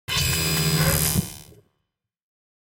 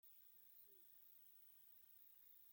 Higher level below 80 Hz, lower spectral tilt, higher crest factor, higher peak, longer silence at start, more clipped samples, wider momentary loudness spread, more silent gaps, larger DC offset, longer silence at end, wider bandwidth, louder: first, -38 dBFS vs under -90 dBFS; first, -3 dB/octave vs -1 dB/octave; first, 22 dB vs 12 dB; first, -4 dBFS vs -54 dBFS; about the same, 0.1 s vs 0.05 s; neither; first, 14 LU vs 0 LU; neither; neither; first, 1.25 s vs 0 s; about the same, 17 kHz vs 17 kHz; first, -21 LUFS vs -64 LUFS